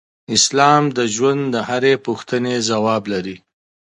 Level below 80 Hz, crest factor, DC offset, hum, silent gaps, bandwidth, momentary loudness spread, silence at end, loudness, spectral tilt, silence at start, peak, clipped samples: -60 dBFS; 18 dB; under 0.1%; none; none; 11.5 kHz; 9 LU; 0.55 s; -17 LUFS; -3.5 dB/octave; 0.3 s; 0 dBFS; under 0.1%